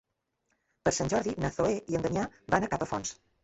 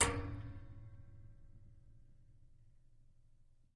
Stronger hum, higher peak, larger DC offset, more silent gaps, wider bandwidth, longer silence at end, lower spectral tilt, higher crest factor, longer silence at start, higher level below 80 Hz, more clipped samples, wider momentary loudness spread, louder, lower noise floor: neither; first, -10 dBFS vs -18 dBFS; neither; neither; second, 8.2 kHz vs 10.5 kHz; about the same, 0.3 s vs 0.3 s; first, -5 dB/octave vs -3 dB/octave; second, 22 dB vs 28 dB; first, 0.85 s vs 0 s; about the same, -52 dBFS vs -56 dBFS; neither; second, 5 LU vs 23 LU; first, -31 LUFS vs -43 LUFS; first, -79 dBFS vs -65 dBFS